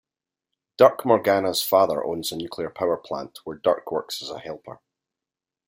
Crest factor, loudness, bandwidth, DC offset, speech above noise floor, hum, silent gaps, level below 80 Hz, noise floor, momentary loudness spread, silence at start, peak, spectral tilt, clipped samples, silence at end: 22 dB; -23 LUFS; 16.5 kHz; under 0.1%; 66 dB; none; none; -66 dBFS; -89 dBFS; 15 LU; 0.8 s; -2 dBFS; -4 dB/octave; under 0.1%; 0.9 s